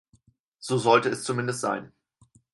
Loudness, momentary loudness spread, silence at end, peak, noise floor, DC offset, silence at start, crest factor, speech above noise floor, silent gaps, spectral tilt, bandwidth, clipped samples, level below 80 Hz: -25 LUFS; 12 LU; 0.65 s; -6 dBFS; -64 dBFS; under 0.1%; 0.6 s; 22 dB; 39 dB; none; -4.5 dB/octave; 11.5 kHz; under 0.1%; -70 dBFS